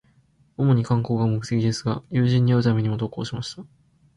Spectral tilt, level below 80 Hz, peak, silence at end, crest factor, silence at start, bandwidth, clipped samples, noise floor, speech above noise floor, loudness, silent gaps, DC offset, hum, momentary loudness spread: -7.5 dB/octave; -54 dBFS; -8 dBFS; 0.55 s; 14 dB; 0.6 s; 10.5 kHz; under 0.1%; -60 dBFS; 38 dB; -23 LUFS; none; under 0.1%; none; 12 LU